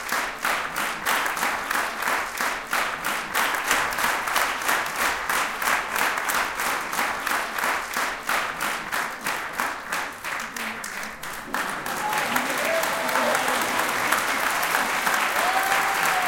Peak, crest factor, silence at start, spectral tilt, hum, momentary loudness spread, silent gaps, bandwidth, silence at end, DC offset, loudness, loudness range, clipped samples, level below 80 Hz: -4 dBFS; 22 dB; 0 s; -1 dB/octave; none; 7 LU; none; 17 kHz; 0 s; under 0.1%; -24 LUFS; 5 LU; under 0.1%; -56 dBFS